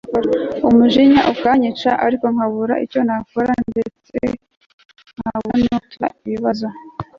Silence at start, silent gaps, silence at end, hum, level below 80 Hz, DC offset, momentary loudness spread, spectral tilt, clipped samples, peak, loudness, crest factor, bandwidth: 0.05 s; 4.57-4.78 s, 4.85-4.89 s; 0.15 s; none; -48 dBFS; under 0.1%; 13 LU; -7 dB/octave; under 0.1%; -2 dBFS; -17 LUFS; 14 dB; 6.8 kHz